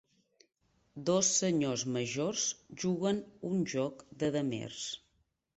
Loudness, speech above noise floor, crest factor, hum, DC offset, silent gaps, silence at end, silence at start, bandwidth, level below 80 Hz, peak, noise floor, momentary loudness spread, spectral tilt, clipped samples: -33 LUFS; 43 dB; 20 dB; none; under 0.1%; none; 0.6 s; 0.95 s; 8.2 kHz; -70 dBFS; -16 dBFS; -76 dBFS; 11 LU; -4 dB/octave; under 0.1%